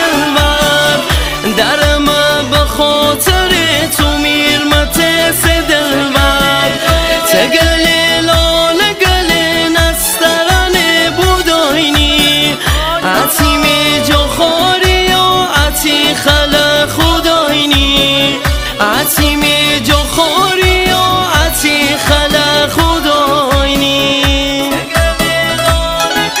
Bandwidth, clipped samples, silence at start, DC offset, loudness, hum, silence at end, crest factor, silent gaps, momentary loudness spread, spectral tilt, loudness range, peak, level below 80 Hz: 16.5 kHz; 0.4%; 0 s; under 0.1%; -9 LUFS; none; 0 s; 10 dB; none; 3 LU; -3 dB/octave; 1 LU; 0 dBFS; -20 dBFS